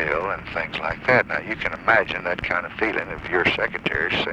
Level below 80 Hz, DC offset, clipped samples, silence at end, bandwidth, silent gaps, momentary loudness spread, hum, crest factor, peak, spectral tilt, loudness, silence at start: -46 dBFS; under 0.1%; under 0.1%; 0 s; 10.5 kHz; none; 8 LU; none; 20 dB; -2 dBFS; -5.5 dB/octave; -22 LUFS; 0 s